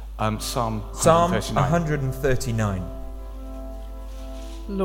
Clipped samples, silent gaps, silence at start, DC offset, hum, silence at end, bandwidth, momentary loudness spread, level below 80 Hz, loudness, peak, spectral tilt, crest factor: under 0.1%; none; 0 s; under 0.1%; none; 0 s; 17 kHz; 19 LU; -34 dBFS; -23 LUFS; -4 dBFS; -5.5 dB/octave; 20 dB